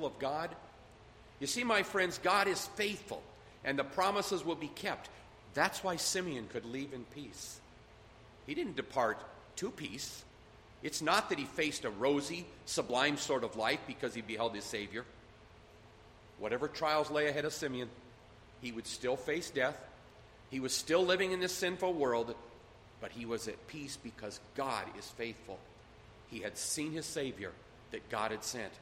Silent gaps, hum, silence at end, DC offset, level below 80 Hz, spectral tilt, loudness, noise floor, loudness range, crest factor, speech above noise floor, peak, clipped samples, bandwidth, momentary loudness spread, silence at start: none; none; 0 s; under 0.1%; -66 dBFS; -3 dB/octave; -36 LUFS; -58 dBFS; 7 LU; 24 dB; 22 dB; -14 dBFS; under 0.1%; 16 kHz; 16 LU; 0 s